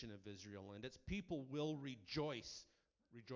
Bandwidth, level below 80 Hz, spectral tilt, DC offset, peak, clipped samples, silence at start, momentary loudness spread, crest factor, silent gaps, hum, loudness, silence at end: 7.6 kHz; -66 dBFS; -5.5 dB/octave; under 0.1%; -32 dBFS; under 0.1%; 0 s; 13 LU; 18 dB; none; none; -49 LUFS; 0 s